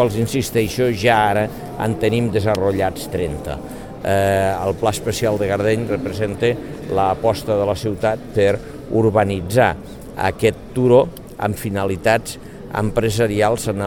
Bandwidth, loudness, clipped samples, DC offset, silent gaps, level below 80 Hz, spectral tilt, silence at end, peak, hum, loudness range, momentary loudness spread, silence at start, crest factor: 18 kHz; -19 LUFS; under 0.1%; 0.4%; none; -40 dBFS; -6 dB/octave; 0 s; -2 dBFS; none; 2 LU; 9 LU; 0 s; 18 dB